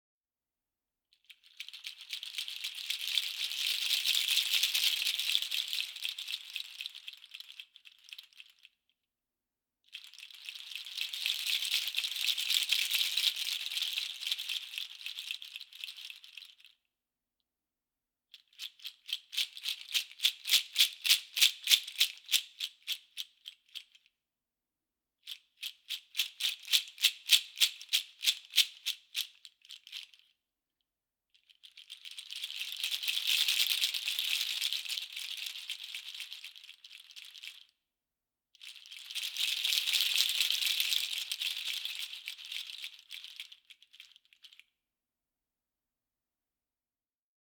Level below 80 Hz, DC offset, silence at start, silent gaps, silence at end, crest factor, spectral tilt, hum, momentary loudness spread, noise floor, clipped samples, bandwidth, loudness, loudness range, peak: under -90 dBFS; under 0.1%; 1.3 s; none; 3.1 s; 30 dB; 8 dB/octave; none; 21 LU; under -90 dBFS; under 0.1%; over 20 kHz; -31 LUFS; 17 LU; -6 dBFS